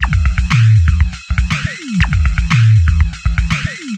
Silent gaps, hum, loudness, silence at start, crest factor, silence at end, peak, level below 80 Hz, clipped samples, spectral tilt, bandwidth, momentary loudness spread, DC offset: none; none; -14 LUFS; 0 s; 12 dB; 0 s; 0 dBFS; -16 dBFS; under 0.1%; -5.5 dB/octave; 9 kHz; 8 LU; under 0.1%